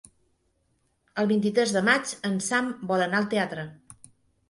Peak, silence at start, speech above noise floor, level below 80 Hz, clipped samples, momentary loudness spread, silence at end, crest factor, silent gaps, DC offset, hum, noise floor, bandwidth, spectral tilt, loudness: -8 dBFS; 1.15 s; 46 dB; -68 dBFS; under 0.1%; 10 LU; 0.55 s; 20 dB; none; under 0.1%; none; -71 dBFS; 11.5 kHz; -4.5 dB/octave; -25 LUFS